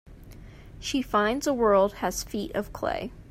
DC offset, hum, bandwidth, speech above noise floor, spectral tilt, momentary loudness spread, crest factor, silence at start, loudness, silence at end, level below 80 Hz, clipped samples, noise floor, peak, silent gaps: under 0.1%; none; 16 kHz; 20 dB; -4 dB/octave; 10 LU; 18 dB; 0.05 s; -27 LUFS; 0 s; -46 dBFS; under 0.1%; -46 dBFS; -10 dBFS; none